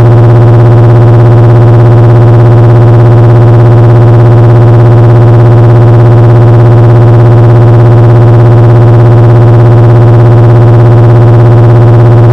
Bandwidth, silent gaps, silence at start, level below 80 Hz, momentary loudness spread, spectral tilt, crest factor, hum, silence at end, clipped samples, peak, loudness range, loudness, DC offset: 4 kHz; none; 0 s; -20 dBFS; 0 LU; -10 dB/octave; 0 dB; 50 Hz at -15 dBFS; 0 s; 90%; 0 dBFS; 0 LU; -2 LUFS; under 0.1%